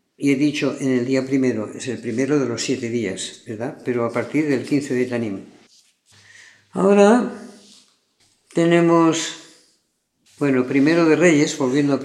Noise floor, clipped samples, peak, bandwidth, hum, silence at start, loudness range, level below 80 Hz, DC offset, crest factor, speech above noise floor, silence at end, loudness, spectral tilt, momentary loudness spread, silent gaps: -69 dBFS; under 0.1%; -2 dBFS; 12 kHz; none; 0.2 s; 5 LU; -72 dBFS; under 0.1%; 18 dB; 50 dB; 0 s; -19 LUFS; -5.5 dB/octave; 14 LU; none